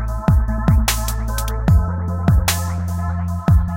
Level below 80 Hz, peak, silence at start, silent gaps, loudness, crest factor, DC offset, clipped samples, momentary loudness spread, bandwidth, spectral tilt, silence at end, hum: -20 dBFS; -2 dBFS; 0 s; none; -19 LUFS; 14 dB; under 0.1%; under 0.1%; 6 LU; 17 kHz; -5.5 dB/octave; 0 s; none